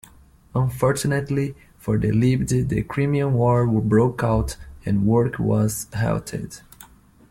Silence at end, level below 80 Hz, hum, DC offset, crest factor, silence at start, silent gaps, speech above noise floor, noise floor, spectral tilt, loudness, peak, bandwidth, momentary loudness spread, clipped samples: 0.45 s; -40 dBFS; none; under 0.1%; 16 dB; 0.55 s; none; 30 dB; -51 dBFS; -7 dB/octave; -22 LUFS; -6 dBFS; 16.5 kHz; 12 LU; under 0.1%